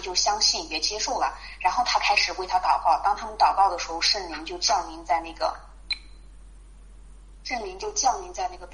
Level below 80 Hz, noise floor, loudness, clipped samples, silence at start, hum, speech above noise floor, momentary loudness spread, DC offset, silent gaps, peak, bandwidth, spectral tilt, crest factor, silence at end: -46 dBFS; -46 dBFS; -24 LUFS; under 0.1%; 0 s; none; 21 dB; 12 LU; under 0.1%; none; -8 dBFS; 10.5 kHz; -0.5 dB/octave; 18 dB; 0 s